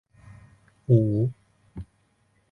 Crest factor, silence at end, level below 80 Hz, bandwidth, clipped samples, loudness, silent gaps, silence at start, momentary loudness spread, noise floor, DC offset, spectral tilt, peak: 20 dB; 0.7 s; -54 dBFS; 2.4 kHz; under 0.1%; -23 LUFS; none; 0.9 s; 24 LU; -67 dBFS; under 0.1%; -12 dB/octave; -6 dBFS